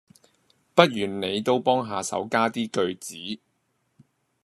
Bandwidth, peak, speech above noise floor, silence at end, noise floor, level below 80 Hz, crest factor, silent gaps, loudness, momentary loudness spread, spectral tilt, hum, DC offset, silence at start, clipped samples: 13.5 kHz; 0 dBFS; 48 dB; 1.05 s; -72 dBFS; -70 dBFS; 26 dB; none; -24 LUFS; 15 LU; -4.5 dB/octave; none; under 0.1%; 0.75 s; under 0.1%